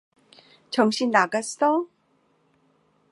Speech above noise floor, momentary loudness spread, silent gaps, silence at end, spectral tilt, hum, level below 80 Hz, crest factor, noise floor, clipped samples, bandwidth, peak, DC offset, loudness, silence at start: 44 dB; 8 LU; none; 1.25 s; -3.5 dB/octave; none; -80 dBFS; 22 dB; -66 dBFS; under 0.1%; 11.5 kHz; -4 dBFS; under 0.1%; -23 LUFS; 0.7 s